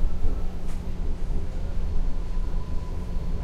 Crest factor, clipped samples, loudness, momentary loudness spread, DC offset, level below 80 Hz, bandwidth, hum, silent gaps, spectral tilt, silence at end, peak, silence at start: 14 dB; under 0.1%; -33 LUFS; 3 LU; under 0.1%; -26 dBFS; 5.2 kHz; none; none; -7.5 dB/octave; 0 s; -10 dBFS; 0 s